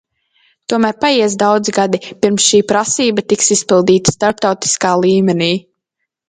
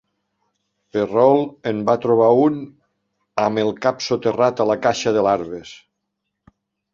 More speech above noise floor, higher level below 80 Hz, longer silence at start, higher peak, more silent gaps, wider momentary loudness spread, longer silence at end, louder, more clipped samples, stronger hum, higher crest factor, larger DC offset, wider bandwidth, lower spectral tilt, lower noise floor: about the same, 62 dB vs 59 dB; first, -52 dBFS vs -60 dBFS; second, 0.7 s vs 0.95 s; about the same, 0 dBFS vs -2 dBFS; neither; second, 6 LU vs 13 LU; second, 0.7 s vs 1.2 s; first, -13 LUFS vs -18 LUFS; neither; neither; about the same, 14 dB vs 18 dB; neither; first, 9.6 kHz vs 7.6 kHz; second, -3.5 dB/octave vs -5.5 dB/octave; about the same, -75 dBFS vs -77 dBFS